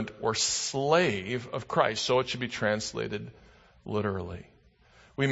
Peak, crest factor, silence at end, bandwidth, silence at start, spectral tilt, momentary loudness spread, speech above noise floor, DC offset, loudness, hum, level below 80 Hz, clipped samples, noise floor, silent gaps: -8 dBFS; 22 dB; 0 s; 8.2 kHz; 0 s; -3.5 dB/octave; 16 LU; 31 dB; under 0.1%; -29 LUFS; none; -60 dBFS; under 0.1%; -60 dBFS; none